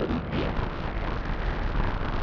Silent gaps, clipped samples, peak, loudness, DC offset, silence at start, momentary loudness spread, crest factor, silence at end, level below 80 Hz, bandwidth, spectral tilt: none; under 0.1%; -12 dBFS; -31 LUFS; under 0.1%; 0 s; 3 LU; 14 dB; 0 s; -30 dBFS; 6 kHz; -8 dB/octave